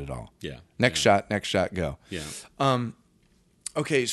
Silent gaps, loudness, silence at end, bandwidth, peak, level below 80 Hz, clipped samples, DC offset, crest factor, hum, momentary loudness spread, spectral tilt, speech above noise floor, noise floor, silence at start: none; -26 LUFS; 0 s; 12 kHz; -4 dBFS; -50 dBFS; under 0.1%; under 0.1%; 22 dB; none; 17 LU; -4.5 dB/octave; 37 dB; -63 dBFS; 0 s